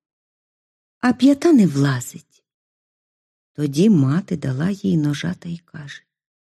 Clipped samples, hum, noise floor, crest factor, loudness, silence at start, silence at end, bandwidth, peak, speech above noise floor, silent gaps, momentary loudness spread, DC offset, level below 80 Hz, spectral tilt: under 0.1%; none; under -90 dBFS; 16 dB; -18 LUFS; 1.05 s; 0.45 s; 13.5 kHz; -4 dBFS; over 72 dB; 2.54-3.55 s; 19 LU; under 0.1%; -60 dBFS; -7 dB/octave